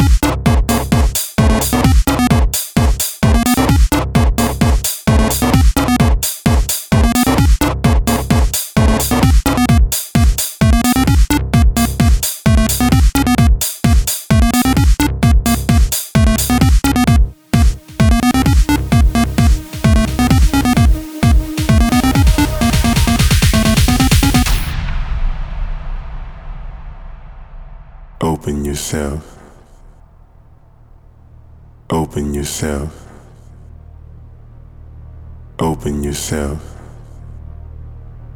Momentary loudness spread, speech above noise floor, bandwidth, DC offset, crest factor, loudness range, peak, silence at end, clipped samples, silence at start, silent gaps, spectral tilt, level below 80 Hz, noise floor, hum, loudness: 12 LU; 25 dB; over 20 kHz; under 0.1%; 14 dB; 12 LU; 0 dBFS; 0 s; under 0.1%; 0 s; none; -5 dB/octave; -16 dBFS; -44 dBFS; none; -14 LUFS